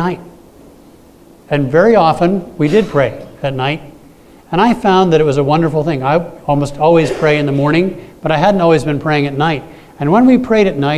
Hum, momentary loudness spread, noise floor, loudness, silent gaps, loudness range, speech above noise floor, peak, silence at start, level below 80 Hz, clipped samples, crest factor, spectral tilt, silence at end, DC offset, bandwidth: none; 10 LU; -42 dBFS; -13 LUFS; none; 2 LU; 30 dB; 0 dBFS; 0 s; -42 dBFS; under 0.1%; 14 dB; -7 dB/octave; 0 s; under 0.1%; 14 kHz